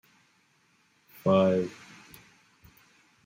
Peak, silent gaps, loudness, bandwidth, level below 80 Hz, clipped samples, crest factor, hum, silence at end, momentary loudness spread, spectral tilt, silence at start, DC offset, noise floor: -10 dBFS; none; -26 LUFS; 16 kHz; -70 dBFS; under 0.1%; 22 dB; none; 1.55 s; 26 LU; -7.5 dB/octave; 1.25 s; under 0.1%; -67 dBFS